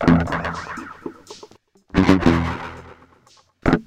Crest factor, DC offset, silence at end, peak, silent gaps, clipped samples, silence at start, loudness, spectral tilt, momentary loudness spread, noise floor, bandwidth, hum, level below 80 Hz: 20 dB; under 0.1%; 0.05 s; 0 dBFS; none; under 0.1%; 0 s; -20 LUFS; -7 dB/octave; 25 LU; -55 dBFS; 10 kHz; none; -36 dBFS